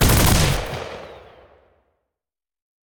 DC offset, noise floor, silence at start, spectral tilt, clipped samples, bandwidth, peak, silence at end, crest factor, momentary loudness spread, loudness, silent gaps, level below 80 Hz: under 0.1%; -90 dBFS; 0 s; -4 dB/octave; under 0.1%; over 20 kHz; -4 dBFS; 1.7 s; 18 dB; 22 LU; -19 LUFS; none; -28 dBFS